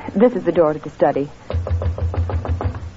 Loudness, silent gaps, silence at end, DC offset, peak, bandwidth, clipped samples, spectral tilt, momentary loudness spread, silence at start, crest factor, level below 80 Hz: -20 LUFS; none; 0 s; under 0.1%; -2 dBFS; 7.4 kHz; under 0.1%; -9.5 dB/octave; 8 LU; 0 s; 16 dB; -30 dBFS